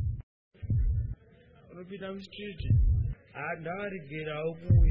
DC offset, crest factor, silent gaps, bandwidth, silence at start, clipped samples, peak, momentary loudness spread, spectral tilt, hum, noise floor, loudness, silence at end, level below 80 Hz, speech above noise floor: under 0.1%; 16 dB; 0.23-0.51 s; 5 kHz; 0 s; under 0.1%; -12 dBFS; 18 LU; -9.5 dB/octave; none; -58 dBFS; -32 LUFS; 0 s; -34 dBFS; 30 dB